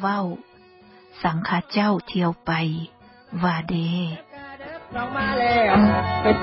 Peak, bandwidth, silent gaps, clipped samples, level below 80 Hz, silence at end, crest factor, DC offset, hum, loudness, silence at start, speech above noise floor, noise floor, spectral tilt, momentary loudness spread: -6 dBFS; 5.8 kHz; none; under 0.1%; -44 dBFS; 0 s; 16 dB; under 0.1%; none; -22 LUFS; 0 s; 28 dB; -50 dBFS; -11 dB/octave; 20 LU